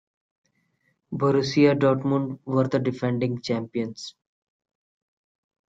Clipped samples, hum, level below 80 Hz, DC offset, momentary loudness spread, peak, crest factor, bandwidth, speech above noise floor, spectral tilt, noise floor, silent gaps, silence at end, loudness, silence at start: under 0.1%; none; -66 dBFS; under 0.1%; 13 LU; -6 dBFS; 20 dB; 7.8 kHz; 48 dB; -7 dB/octave; -71 dBFS; none; 1.6 s; -24 LUFS; 1.1 s